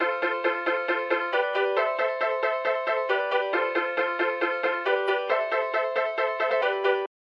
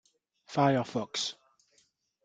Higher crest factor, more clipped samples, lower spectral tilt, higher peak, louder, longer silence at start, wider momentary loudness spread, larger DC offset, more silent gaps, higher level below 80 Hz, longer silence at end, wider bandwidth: second, 16 dB vs 22 dB; neither; second, -3.5 dB/octave vs -5 dB/octave; about the same, -10 dBFS vs -12 dBFS; first, -25 LUFS vs -30 LUFS; second, 0 s vs 0.5 s; second, 2 LU vs 9 LU; neither; neither; second, under -90 dBFS vs -74 dBFS; second, 0.15 s vs 0.95 s; second, 6.6 kHz vs 9.4 kHz